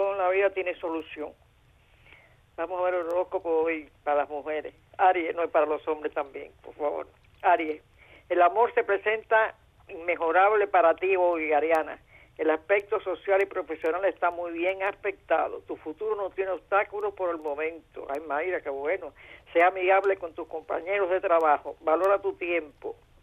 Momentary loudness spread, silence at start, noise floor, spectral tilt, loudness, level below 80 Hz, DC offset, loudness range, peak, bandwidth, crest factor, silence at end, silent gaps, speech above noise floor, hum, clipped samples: 14 LU; 0 s; -60 dBFS; -5.5 dB/octave; -27 LUFS; -64 dBFS; under 0.1%; 6 LU; -8 dBFS; 11 kHz; 18 dB; 0.3 s; none; 34 dB; none; under 0.1%